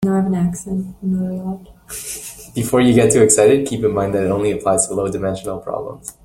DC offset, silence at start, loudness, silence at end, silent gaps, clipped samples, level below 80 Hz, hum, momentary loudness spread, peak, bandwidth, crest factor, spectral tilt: under 0.1%; 0 s; -17 LUFS; 0.15 s; none; under 0.1%; -46 dBFS; none; 16 LU; 0 dBFS; 16.5 kHz; 16 dB; -5 dB/octave